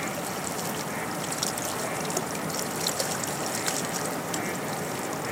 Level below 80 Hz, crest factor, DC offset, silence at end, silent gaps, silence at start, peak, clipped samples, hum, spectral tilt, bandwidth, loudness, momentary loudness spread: -62 dBFS; 20 dB; under 0.1%; 0 s; none; 0 s; -10 dBFS; under 0.1%; none; -3 dB/octave; 17 kHz; -29 LUFS; 4 LU